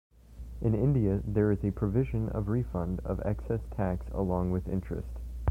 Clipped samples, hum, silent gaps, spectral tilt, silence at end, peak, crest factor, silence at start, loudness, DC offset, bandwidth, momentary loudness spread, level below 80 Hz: under 0.1%; none; none; -10.5 dB/octave; 0 s; -14 dBFS; 16 dB; 0.3 s; -31 LUFS; under 0.1%; 3.8 kHz; 8 LU; -40 dBFS